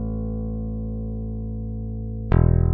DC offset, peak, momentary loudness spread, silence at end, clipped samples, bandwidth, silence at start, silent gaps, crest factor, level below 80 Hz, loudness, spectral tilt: under 0.1%; -6 dBFS; 12 LU; 0 s; under 0.1%; 3.7 kHz; 0 s; none; 18 dB; -28 dBFS; -26 LUFS; -11 dB/octave